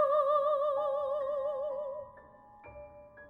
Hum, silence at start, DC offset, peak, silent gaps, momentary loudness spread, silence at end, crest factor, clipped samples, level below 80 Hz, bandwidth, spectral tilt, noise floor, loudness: none; 0 s; under 0.1%; -18 dBFS; none; 23 LU; 0 s; 16 dB; under 0.1%; -68 dBFS; 4.3 kHz; -5.5 dB/octave; -55 dBFS; -32 LUFS